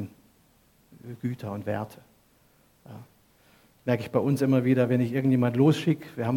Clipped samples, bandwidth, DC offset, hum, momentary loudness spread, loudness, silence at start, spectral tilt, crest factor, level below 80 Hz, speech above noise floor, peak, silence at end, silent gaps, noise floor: under 0.1%; 17 kHz; under 0.1%; none; 20 LU; -26 LUFS; 0 s; -8 dB/octave; 18 dB; -68 dBFS; 38 dB; -10 dBFS; 0 s; none; -62 dBFS